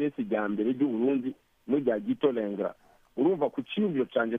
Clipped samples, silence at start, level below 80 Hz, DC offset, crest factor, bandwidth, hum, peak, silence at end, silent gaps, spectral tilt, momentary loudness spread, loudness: under 0.1%; 0 s; -72 dBFS; under 0.1%; 18 dB; 3.8 kHz; none; -12 dBFS; 0 s; none; -8.5 dB/octave; 8 LU; -29 LUFS